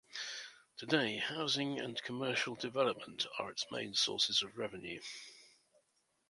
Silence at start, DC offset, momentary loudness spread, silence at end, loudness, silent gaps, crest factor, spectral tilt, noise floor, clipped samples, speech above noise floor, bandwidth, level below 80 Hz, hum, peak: 0.1 s; under 0.1%; 15 LU; 0.8 s; -36 LUFS; none; 24 dB; -2.5 dB/octave; -79 dBFS; under 0.1%; 41 dB; 11.5 kHz; -78 dBFS; none; -14 dBFS